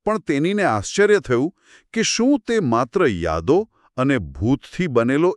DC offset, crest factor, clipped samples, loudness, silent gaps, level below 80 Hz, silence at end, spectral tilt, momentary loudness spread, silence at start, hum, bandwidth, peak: under 0.1%; 16 dB; under 0.1%; -20 LUFS; none; -44 dBFS; 0 s; -5 dB/octave; 5 LU; 0.05 s; none; 11 kHz; -4 dBFS